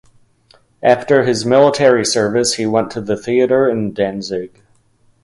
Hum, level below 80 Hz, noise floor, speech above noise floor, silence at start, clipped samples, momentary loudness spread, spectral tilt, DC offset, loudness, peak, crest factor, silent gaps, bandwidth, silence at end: none; -54 dBFS; -55 dBFS; 41 dB; 0.8 s; under 0.1%; 10 LU; -4.5 dB/octave; under 0.1%; -15 LUFS; 0 dBFS; 16 dB; none; 11.5 kHz; 0.75 s